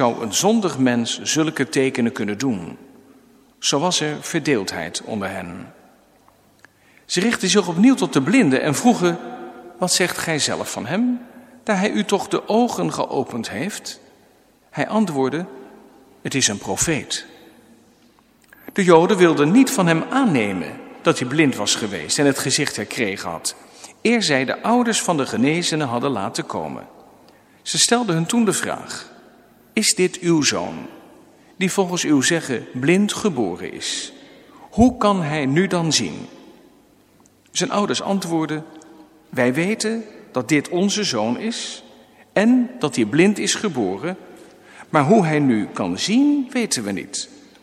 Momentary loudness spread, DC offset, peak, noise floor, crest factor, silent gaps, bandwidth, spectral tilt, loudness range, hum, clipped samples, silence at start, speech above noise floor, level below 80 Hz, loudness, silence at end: 13 LU; under 0.1%; 0 dBFS; -55 dBFS; 20 dB; none; 15.5 kHz; -4 dB/octave; 6 LU; none; under 0.1%; 0 s; 35 dB; -54 dBFS; -19 LUFS; 0.25 s